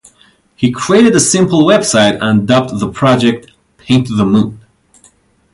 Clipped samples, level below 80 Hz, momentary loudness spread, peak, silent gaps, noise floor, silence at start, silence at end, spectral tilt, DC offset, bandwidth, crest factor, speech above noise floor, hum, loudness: under 0.1%; -44 dBFS; 8 LU; 0 dBFS; none; -49 dBFS; 0.6 s; 0.95 s; -4.5 dB/octave; under 0.1%; 11.5 kHz; 12 dB; 39 dB; none; -11 LUFS